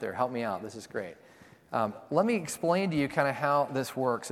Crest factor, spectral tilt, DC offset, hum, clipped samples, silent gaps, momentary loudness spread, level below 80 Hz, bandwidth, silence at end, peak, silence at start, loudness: 20 dB; -5.5 dB/octave; under 0.1%; none; under 0.1%; none; 11 LU; -68 dBFS; 16.5 kHz; 0 s; -10 dBFS; 0 s; -30 LUFS